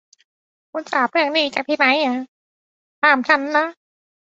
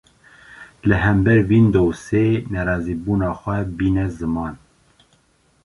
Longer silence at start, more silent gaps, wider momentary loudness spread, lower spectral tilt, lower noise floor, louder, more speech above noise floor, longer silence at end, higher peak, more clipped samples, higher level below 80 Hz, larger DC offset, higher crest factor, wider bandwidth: first, 0.75 s vs 0.5 s; first, 2.28-3.02 s vs none; first, 13 LU vs 10 LU; second, -2.5 dB/octave vs -8.5 dB/octave; first, under -90 dBFS vs -60 dBFS; about the same, -18 LUFS vs -19 LUFS; first, over 72 dB vs 42 dB; second, 0.6 s vs 1.1 s; about the same, 0 dBFS vs -2 dBFS; neither; second, -72 dBFS vs -36 dBFS; neither; about the same, 20 dB vs 18 dB; second, 8 kHz vs 11.5 kHz